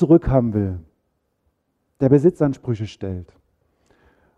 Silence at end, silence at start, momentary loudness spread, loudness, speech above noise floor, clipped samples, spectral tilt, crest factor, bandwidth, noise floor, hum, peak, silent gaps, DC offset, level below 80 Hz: 1.15 s; 0 s; 16 LU; -19 LUFS; 53 dB; under 0.1%; -10 dB/octave; 18 dB; 8 kHz; -71 dBFS; none; -2 dBFS; none; under 0.1%; -40 dBFS